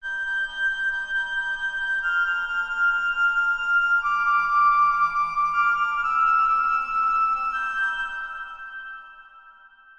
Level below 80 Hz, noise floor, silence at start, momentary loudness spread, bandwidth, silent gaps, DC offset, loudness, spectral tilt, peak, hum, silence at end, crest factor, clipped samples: -54 dBFS; -51 dBFS; 0 s; 11 LU; 8.4 kHz; none; under 0.1%; -22 LUFS; -0.5 dB/octave; -10 dBFS; none; 0.45 s; 12 dB; under 0.1%